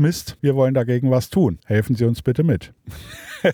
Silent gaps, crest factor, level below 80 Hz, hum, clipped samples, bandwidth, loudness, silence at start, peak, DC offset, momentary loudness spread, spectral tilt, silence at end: none; 14 dB; -46 dBFS; none; under 0.1%; 19 kHz; -20 LUFS; 0 s; -6 dBFS; under 0.1%; 18 LU; -7 dB/octave; 0 s